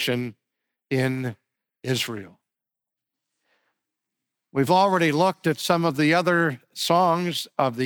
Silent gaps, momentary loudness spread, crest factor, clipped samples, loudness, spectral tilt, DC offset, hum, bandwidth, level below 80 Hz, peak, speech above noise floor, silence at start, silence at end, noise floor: none; 11 LU; 18 dB; under 0.1%; -23 LUFS; -5 dB/octave; under 0.1%; none; over 20 kHz; -70 dBFS; -6 dBFS; 65 dB; 0 s; 0 s; -87 dBFS